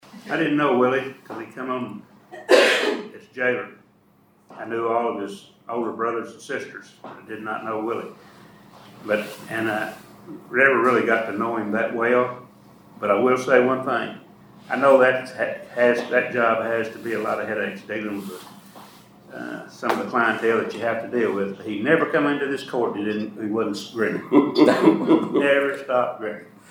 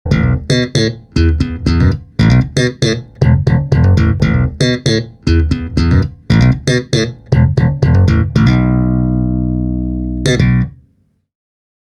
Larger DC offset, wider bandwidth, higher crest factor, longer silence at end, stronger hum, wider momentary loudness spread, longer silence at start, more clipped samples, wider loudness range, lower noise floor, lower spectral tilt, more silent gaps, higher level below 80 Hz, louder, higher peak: neither; first, 20 kHz vs 11 kHz; first, 22 dB vs 12 dB; second, 0.25 s vs 1.2 s; neither; first, 19 LU vs 5 LU; about the same, 0.15 s vs 0.05 s; neither; first, 9 LU vs 2 LU; about the same, -58 dBFS vs -57 dBFS; second, -5 dB/octave vs -6.5 dB/octave; neither; second, -72 dBFS vs -22 dBFS; second, -22 LUFS vs -13 LUFS; about the same, -2 dBFS vs 0 dBFS